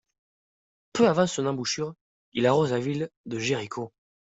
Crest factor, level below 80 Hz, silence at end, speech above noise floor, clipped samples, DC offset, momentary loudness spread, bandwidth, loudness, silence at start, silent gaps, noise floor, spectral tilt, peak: 20 dB; -66 dBFS; 0.35 s; over 65 dB; under 0.1%; under 0.1%; 13 LU; 8.2 kHz; -26 LUFS; 0.95 s; 2.01-2.32 s, 3.17-3.24 s; under -90 dBFS; -5 dB/octave; -6 dBFS